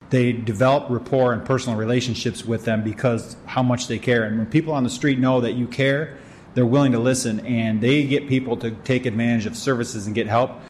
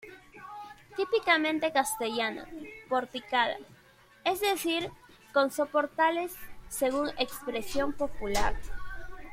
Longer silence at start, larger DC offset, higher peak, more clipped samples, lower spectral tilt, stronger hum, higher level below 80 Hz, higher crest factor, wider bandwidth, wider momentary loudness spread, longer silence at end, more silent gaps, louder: about the same, 0 s vs 0 s; neither; about the same, -6 dBFS vs -8 dBFS; neither; first, -6 dB/octave vs -3 dB/octave; neither; second, -54 dBFS vs -46 dBFS; second, 14 dB vs 22 dB; second, 13.5 kHz vs 16.5 kHz; second, 7 LU vs 18 LU; about the same, 0 s vs 0 s; neither; first, -21 LUFS vs -30 LUFS